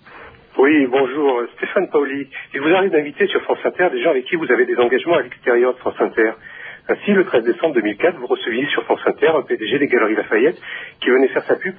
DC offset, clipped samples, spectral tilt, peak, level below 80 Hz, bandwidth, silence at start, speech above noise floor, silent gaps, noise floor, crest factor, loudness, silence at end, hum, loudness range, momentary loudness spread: under 0.1%; under 0.1%; -9.5 dB/octave; -2 dBFS; -64 dBFS; 3.7 kHz; 0.15 s; 24 dB; none; -41 dBFS; 14 dB; -17 LUFS; 0.05 s; none; 1 LU; 7 LU